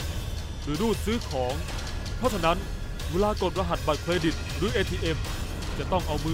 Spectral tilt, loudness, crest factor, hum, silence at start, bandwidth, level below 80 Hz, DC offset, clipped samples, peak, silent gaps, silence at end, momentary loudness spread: -5 dB/octave; -28 LUFS; 18 dB; none; 0 s; 16 kHz; -34 dBFS; under 0.1%; under 0.1%; -10 dBFS; none; 0 s; 8 LU